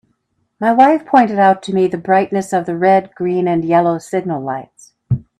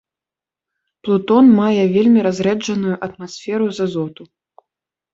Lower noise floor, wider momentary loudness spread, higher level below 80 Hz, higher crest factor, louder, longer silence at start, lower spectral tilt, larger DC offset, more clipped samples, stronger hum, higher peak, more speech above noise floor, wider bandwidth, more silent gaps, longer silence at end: second, -66 dBFS vs -88 dBFS; second, 11 LU vs 16 LU; first, -50 dBFS vs -60 dBFS; about the same, 16 dB vs 14 dB; about the same, -15 LUFS vs -16 LUFS; second, 0.6 s vs 1.05 s; about the same, -7 dB/octave vs -6.5 dB/octave; neither; neither; neither; about the same, 0 dBFS vs -2 dBFS; second, 51 dB vs 73 dB; first, 12.5 kHz vs 7.8 kHz; neither; second, 0.2 s vs 0.9 s